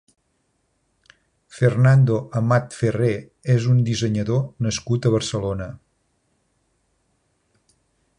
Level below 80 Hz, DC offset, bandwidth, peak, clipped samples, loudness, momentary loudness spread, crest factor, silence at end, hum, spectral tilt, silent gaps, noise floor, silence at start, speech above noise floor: -48 dBFS; under 0.1%; 10.5 kHz; -4 dBFS; under 0.1%; -21 LUFS; 10 LU; 18 dB; 2.45 s; none; -6.5 dB/octave; none; -69 dBFS; 1.55 s; 50 dB